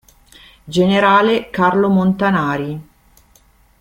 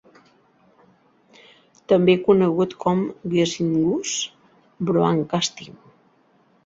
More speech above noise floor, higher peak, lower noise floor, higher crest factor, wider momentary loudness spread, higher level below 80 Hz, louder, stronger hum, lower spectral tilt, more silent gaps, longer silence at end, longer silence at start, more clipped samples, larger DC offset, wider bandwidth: about the same, 38 dB vs 40 dB; about the same, -2 dBFS vs -4 dBFS; second, -52 dBFS vs -60 dBFS; about the same, 16 dB vs 18 dB; about the same, 11 LU vs 10 LU; first, -50 dBFS vs -60 dBFS; first, -15 LUFS vs -21 LUFS; neither; first, -7 dB/octave vs -5.5 dB/octave; neither; about the same, 1 s vs 0.95 s; second, 0.65 s vs 1.9 s; neither; neither; first, 10 kHz vs 8 kHz